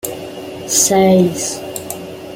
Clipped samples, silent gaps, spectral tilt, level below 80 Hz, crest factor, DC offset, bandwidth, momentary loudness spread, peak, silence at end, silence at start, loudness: under 0.1%; none; -4 dB/octave; -54 dBFS; 16 dB; under 0.1%; 17 kHz; 18 LU; 0 dBFS; 0 s; 0.05 s; -13 LUFS